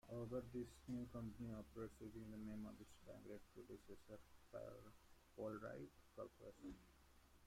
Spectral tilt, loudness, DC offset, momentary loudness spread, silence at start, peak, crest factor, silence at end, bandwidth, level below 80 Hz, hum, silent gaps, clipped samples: -7 dB/octave; -56 LUFS; under 0.1%; 12 LU; 0.05 s; -38 dBFS; 18 dB; 0 s; 16 kHz; -70 dBFS; none; none; under 0.1%